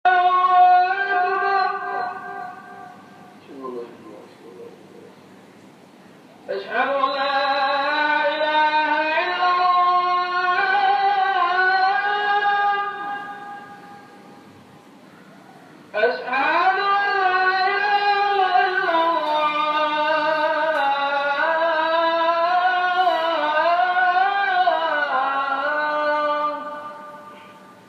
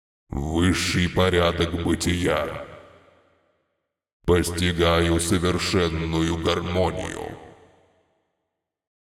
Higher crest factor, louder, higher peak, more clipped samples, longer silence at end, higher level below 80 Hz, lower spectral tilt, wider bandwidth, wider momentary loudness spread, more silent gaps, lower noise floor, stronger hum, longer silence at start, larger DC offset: about the same, 16 dB vs 18 dB; first, -19 LUFS vs -23 LUFS; about the same, -4 dBFS vs -6 dBFS; neither; second, 0.15 s vs 1.6 s; second, -86 dBFS vs -42 dBFS; second, -3.5 dB/octave vs -5 dB/octave; second, 8 kHz vs 16 kHz; first, 15 LU vs 12 LU; second, none vs 4.13-4.20 s; second, -47 dBFS vs -81 dBFS; neither; second, 0.05 s vs 0.3 s; neither